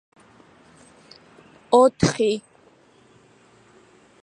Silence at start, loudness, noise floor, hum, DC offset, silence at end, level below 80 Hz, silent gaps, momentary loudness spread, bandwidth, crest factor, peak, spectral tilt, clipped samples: 1.7 s; -20 LUFS; -55 dBFS; none; under 0.1%; 1.85 s; -54 dBFS; none; 8 LU; 11 kHz; 22 dB; -2 dBFS; -5.5 dB/octave; under 0.1%